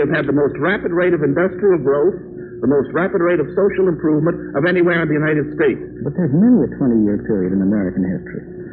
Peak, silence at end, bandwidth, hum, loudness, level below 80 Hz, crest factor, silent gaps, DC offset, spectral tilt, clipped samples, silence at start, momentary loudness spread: -4 dBFS; 0 s; 4.4 kHz; none; -17 LUFS; -46 dBFS; 12 dB; none; under 0.1%; -7 dB/octave; under 0.1%; 0 s; 7 LU